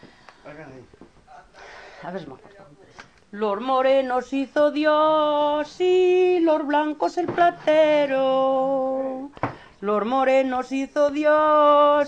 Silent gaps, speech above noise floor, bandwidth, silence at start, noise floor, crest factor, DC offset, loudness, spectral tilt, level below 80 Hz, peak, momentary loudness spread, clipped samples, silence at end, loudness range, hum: none; 26 dB; 8.6 kHz; 0.05 s; -47 dBFS; 14 dB; under 0.1%; -21 LUFS; -5.5 dB/octave; -60 dBFS; -6 dBFS; 14 LU; under 0.1%; 0 s; 9 LU; none